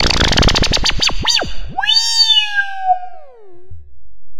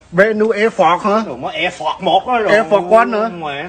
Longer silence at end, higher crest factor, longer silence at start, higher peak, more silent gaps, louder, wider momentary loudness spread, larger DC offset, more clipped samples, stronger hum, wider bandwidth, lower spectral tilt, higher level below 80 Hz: about the same, 0 s vs 0 s; about the same, 14 dB vs 14 dB; about the same, 0 s vs 0.1 s; about the same, 0 dBFS vs 0 dBFS; neither; about the same, -13 LUFS vs -14 LUFS; about the same, 9 LU vs 7 LU; first, 7% vs under 0.1%; neither; neither; first, 16 kHz vs 9.4 kHz; second, -2 dB/octave vs -5 dB/octave; first, -24 dBFS vs -52 dBFS